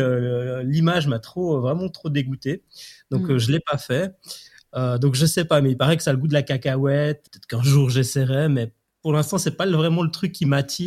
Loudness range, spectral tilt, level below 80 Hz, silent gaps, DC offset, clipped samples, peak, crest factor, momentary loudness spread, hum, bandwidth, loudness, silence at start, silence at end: 4 LU; -6 dB/octave; -56 dBFS; none; under 0.1%; under 0.1%; -4 dBFS; 16 dB; 12 LU; none; 14.5 kHz; -21 LUFS; 0 s; 0 s